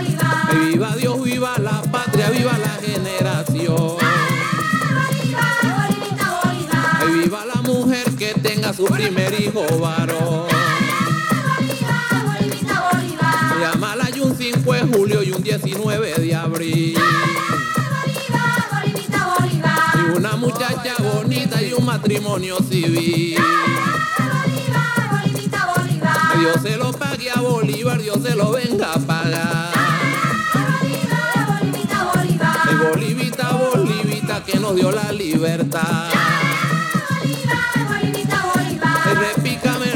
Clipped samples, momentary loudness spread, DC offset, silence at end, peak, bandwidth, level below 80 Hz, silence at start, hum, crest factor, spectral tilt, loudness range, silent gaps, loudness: under 0.1%; 5 LU; under 0.1%; 0 s; -4 dBFS; 18.5 kHz; -54 dBFS; 0 s; none; 14 dB; -5 dB/octave; 1 LU; none; -18 LUFS